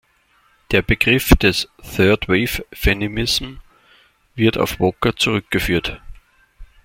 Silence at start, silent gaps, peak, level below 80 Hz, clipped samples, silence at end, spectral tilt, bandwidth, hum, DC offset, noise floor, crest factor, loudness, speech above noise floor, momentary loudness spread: 0.7 s; none; 0 dBFS; -30 dBFS; under 0.1%; 0.2 s; -5 dB/octave; 16.5 kHz; none; under 0.1%; -58 dBFS; 20 dB; -18 LUFS; 41 dB; 9 LU